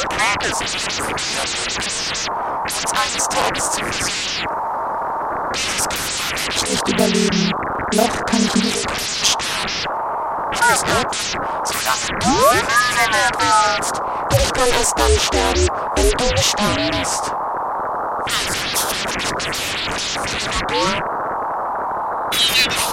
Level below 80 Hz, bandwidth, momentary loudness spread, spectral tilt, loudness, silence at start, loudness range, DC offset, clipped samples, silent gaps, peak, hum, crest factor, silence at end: -34 dBFS; 16.5 kHz; 8 LU; -2.5 dB/octave; -18 LUFS; 0 s; 4 LU; under 0.1%; under 0.1%; none; -2 dBFS; none; 18 dB; 0 s